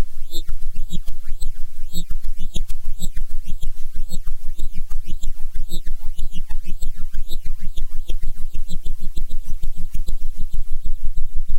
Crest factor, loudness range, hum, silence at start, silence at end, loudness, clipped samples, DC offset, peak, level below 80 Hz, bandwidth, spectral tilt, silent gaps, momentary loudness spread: 8 dB; 1 LU; none; 0 s; 0 s; -33 LUFS; under 0.1%; under 0.1%; -4 dBFS; -20 dBFS; 8 kHz; -5 dB/octave; none; 2 LU